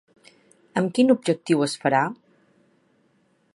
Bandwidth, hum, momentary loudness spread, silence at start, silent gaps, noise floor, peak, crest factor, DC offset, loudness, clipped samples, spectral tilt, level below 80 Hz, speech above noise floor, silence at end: 11.5 kHz; none; 10 LU; 0.75 s; none; -65 dBFS; -6 dBFS; 20 dB; under 0.1%; -22 LUFS; under 0.1%; -5.5 dB/octave; -76 dBFS; 44 dB; 1.4 s